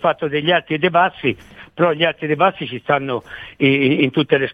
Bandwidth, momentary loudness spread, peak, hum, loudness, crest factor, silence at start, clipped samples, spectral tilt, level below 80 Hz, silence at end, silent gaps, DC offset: 6.2 kHz; 11 LU; -2 dBFS; none; -17 LUFS; 16 dB; 0 s; under 0.1%; -8 dB/octave; -56 dBFS; 0 s; none; under 0.1%